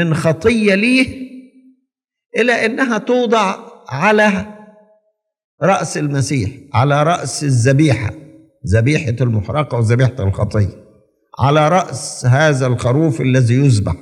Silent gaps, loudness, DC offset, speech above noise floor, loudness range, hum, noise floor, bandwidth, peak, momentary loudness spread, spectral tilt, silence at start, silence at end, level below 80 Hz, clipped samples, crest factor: 5.44-5.58 s; -15 LUFS; under 0.1%; 57 dB; 2 LU; none; -71 dBFS; 11.5 kHz; 0 dBFS; 8 LU; -6 dB/octave; 0 s; 0 s; -46 dBFS; under 0.1%; 16 dB